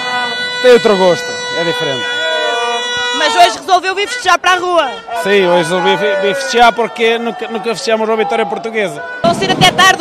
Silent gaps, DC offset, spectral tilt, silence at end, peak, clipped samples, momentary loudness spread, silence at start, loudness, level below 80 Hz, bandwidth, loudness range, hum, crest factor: none; under 0.1%; -3 dB/octave; 0 s; 0 dBFS; 0.2%; 8 LU; 0 s; -12 LUFS; -48 dBFS; 15.5 kHz; 2 LU; none; 12 dB